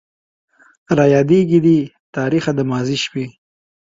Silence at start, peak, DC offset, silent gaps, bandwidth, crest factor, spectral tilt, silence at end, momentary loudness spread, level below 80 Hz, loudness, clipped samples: 0.9 s; 0 dBFS; under 0.1%; 2.00-2.13 s; 7.8 kHz; 16 dB; -6.5 dB/octave; 0.5 s; 12 LU; -54 dBFS; -16 LUFS; under 0.1%